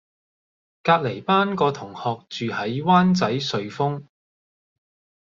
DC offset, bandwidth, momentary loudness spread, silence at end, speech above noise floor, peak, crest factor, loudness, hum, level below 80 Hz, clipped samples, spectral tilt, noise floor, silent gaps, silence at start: under 0.1%; 7.4 kHz; 11 LU; 1.2 s; over 69 dB; -2 dBFS; 20 dB; -22 LUFS; none; -64 dBFS; under 0.1%; -6 dB/octave; under -90 dBFS; none; 0.85 s